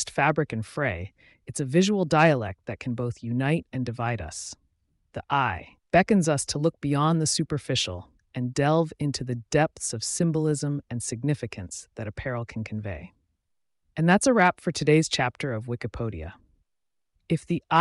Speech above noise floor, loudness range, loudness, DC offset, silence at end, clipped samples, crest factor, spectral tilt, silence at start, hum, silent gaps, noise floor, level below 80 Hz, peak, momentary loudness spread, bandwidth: 58 dB; 5 LU; -26 LUFS; under 0.1%; 0 s; under 0.1%; 18 dB; -5 dB/octave; 0 s; none; none; -84 dBFS; -52 dBFS; -8 dBFS; 16 LU; 11.5 kHz